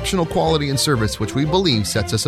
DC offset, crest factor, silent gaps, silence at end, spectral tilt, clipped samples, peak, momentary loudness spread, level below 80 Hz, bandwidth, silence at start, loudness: under 0.1%; 14 dB; none; 0 s; -4.5 dB/octave; under 0.1%; -4 dBFS; 3 LU; -36 dBFS; 15.5 kHz; 0 s; -18 LUFS